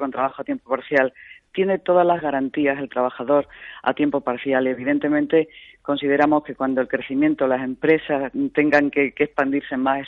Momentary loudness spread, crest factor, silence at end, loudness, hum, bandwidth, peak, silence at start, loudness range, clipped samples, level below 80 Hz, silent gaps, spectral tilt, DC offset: 8 LU; 16 dB; 0 s; -21 LUFS; none; 6.6 kHz; -4 dBFS; 0 s; 2 LU; under 0.1%; -60 dBFS; none; -7.5 dB/octave; under 0.1%